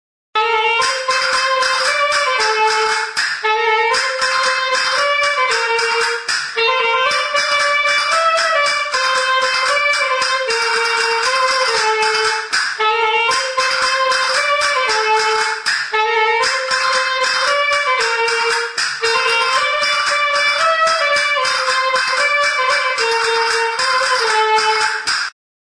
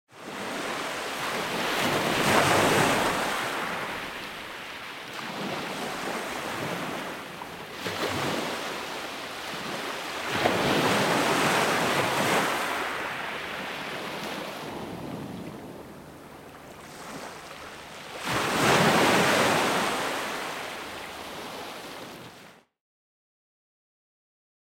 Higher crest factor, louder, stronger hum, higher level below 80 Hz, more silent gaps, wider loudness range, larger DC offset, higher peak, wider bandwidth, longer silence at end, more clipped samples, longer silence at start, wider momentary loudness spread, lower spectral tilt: second, 12 dB vs 22 dB; first, -15 LUFS vs -27 LUFS; neither; about the same, -58 dBFS vs -58 dBFS; neither; second, 1 LU vs 14 LU; neither; about the same, -4 dBFS vs -6 dBFS; second, 10.5 kHz vs 17.5 kHz; second, 0.35 s vs 2.1 s; neither; first, 0.35 s vs 0.1 s; second, 3 LU vs 19 LU; second, 1.5 dB/octave vs -3.5 dB/octave